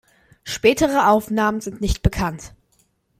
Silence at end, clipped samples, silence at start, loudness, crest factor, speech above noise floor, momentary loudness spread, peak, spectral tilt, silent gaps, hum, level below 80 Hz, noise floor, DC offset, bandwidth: 0.7 s; under 0.1%; 0.45 s; -20 LUFS; 18 dB; 44 dB; 13 LU; -2 dBFS; -5 dB/octave; none; none; -34 dBFS; -63 dBFS; under 0.1%; 16 kHz